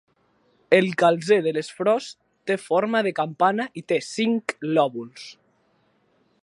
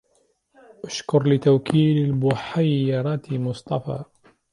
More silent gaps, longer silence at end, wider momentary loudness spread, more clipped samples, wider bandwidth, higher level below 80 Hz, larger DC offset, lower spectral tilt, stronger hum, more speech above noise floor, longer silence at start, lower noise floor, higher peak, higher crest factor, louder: neither; first, 1.1 s vs 0.5 s; first, 16 LU vs 13 LU; neither; about the same, 11.5 kHz vs 11 kHz; second, -76 dBFS vs -58 dBFS; neither; second, -5.5 dB/octave vs -7.5 dB/octave; neither; about the same, 43 dB vs 45 dB; second, 0.7 s vs 0.85 s; about the same, -65 dBFS vs -65 dBFS; first, -2 dBFS vs -6 dBFS; about the same, 22 dB vs 18 dB; about the same, -22 LUFS vs -22 LUFS